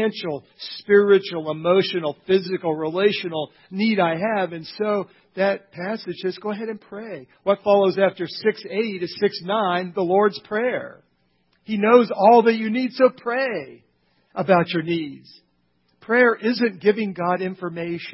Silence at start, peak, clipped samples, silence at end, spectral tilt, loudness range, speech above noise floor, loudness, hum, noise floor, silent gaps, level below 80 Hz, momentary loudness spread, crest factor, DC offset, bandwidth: 0 s; 0 dBFS; under 0.1%; 0 s; -10 dB/octave; 5 LU; 45 dB; -21 LUFS; none; -66 dBFS; none; -68 dBFS; 14 LU; 20 dB; under 0.1%; 5.8 kHz